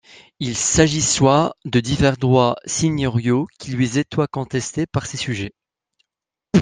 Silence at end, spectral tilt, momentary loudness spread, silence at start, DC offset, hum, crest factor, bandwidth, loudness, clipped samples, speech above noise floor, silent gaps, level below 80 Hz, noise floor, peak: 0 s; -4.5 dB/octave; 10 LU; 0.4 s; under 0.1%; none; 18 dB; 10 kHz; -19 LUFS; under 0.1%; 66 dB; none; -44 dBFS; -85 dBFS; 0 dBFS